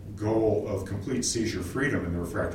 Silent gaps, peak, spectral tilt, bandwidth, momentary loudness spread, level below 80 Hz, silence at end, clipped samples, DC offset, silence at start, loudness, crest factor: none; -12 dBFS; -5 dB/octave; 16 kHz; 6 LU; -46 dBFS; 0 s; under 0.1%; under 0.1%; 0 s; -28 LUFS; 16 dB